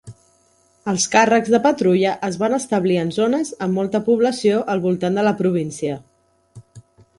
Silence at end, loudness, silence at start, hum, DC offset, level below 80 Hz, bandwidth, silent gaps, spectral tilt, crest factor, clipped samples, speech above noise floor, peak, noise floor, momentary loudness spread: 0.4 s; -19 LUFS; 0.05 s; none; under 0.1%; -60 dBFS; 11.5 kHz; none; -5 dB/octave; 18 dB; under 0.1%; 40 dB; -2 dBFS; -58 dBFS; 9 LU